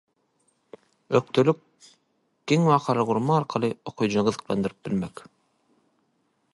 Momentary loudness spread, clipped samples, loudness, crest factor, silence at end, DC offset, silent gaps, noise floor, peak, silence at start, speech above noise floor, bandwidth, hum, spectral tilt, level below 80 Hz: 9 LU; under 0.1%; -24 LUFS; 20 dB; 1.45 s; under 0.1%; none; -71 dBFS; -6 dBFS; 1.1 s; 47 dB; 11.5 kHz; none; -6.5 dB/octave; -62 dBFS